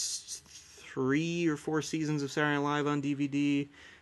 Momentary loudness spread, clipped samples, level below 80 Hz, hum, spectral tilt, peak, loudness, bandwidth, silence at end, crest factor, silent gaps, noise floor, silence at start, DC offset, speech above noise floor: 13 LU; under 0.1%; -70 dBFS; none; -4.5 dB/octave; -16 dBFS; -31 LUFS; 12.5 kHz; 0.05 s; 16 dB; none; -52 dBFS; 0 s; under 0.1%; 21 dB